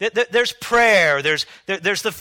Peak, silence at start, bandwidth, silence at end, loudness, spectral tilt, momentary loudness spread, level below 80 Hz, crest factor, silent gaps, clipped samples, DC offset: -2 dBFS; 0 s; 17.5 kHz; 0 s; -17 LUFS; -2.5 dB/octave; 9 LU; -52 dBFS; 16 dB; none; under 0.1%; under 0.1%